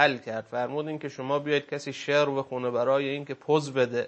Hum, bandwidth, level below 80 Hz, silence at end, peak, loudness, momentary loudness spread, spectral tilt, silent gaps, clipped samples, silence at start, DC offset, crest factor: none; 8.8 kHz; -76 dBFS; 0 s; -4 dBFS; -28 LUFS; 9 LU; -5 dB/octave; none; under 0.1%; 0 s; under 0.1%; 22 dB